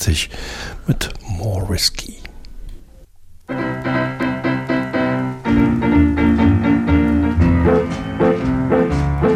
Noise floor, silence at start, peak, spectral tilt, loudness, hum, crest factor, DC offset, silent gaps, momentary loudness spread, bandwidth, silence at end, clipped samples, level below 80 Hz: -41 dBFS; 0 s; -4 dBFS; -6 dB/octave; -17 LUFS; none; 14 dB; under 0.1%; none; 11 LU; 16 kHz; 0 s; under 0.1%; -28 dBFS